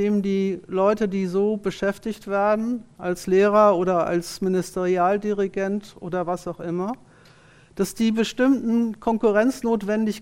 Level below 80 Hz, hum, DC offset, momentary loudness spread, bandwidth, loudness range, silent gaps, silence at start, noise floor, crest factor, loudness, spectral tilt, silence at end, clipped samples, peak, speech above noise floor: -54 dBFS; none; under 0.1%; 10 LU; 16 kHz; 5 LU; none; 0 s; -52 dBFS; 18 dB; -23 LUFS; -6 dB/octave; 0 s; under 0.1%; -4 dBFS; 30 dB